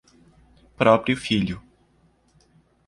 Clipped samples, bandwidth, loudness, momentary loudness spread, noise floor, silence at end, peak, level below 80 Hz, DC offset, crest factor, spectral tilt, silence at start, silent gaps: under 0.1%; 11.5 kHz; -21 LUFS; 11 LU; -61 dBFS; 1.3 s; -2 dBFS; -52 dBFS; under 0.1%; 22 dB; -6 dB/octave; 0.8 s; none